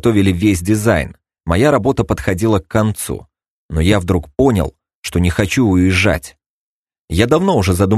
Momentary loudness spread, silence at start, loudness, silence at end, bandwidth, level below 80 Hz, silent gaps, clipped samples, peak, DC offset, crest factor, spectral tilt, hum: 11 LU; 0.05 s; -15 LUFS; 0 s; 13 kHz; -32 dBFS; 3.50-3.69 s, 4.95-5.03 s, 6.46-6.85 s, 6.99-7.08 s; under 0.1%; 0 dBFS; under 0.1%; 16 dB; -6 dB/octave; none